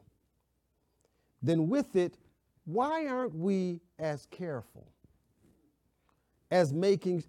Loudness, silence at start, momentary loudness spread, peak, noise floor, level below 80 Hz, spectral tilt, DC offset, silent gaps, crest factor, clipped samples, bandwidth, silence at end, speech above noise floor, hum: -32 LUFS; 1.4 s; 11 LU; -16 dBFS; -77 dBFS; -74 dBFS; -7 dB/octave; under 0.1%; none; 18 dB; under 0.1%; 13.5 kHz; 0.05 s; 46 dB; none